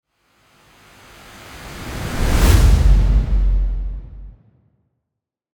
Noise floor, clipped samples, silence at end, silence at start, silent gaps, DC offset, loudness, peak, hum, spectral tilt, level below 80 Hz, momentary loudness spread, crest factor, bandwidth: -82 dBFS; under 0.1%; 1.25 s; 1.5 s; none; under 0.1%; -18 LUFS; 0 dBFS; none; -5.5 dB/octave; -18 dBFS; 24 LU; 18 dB; 20 kHz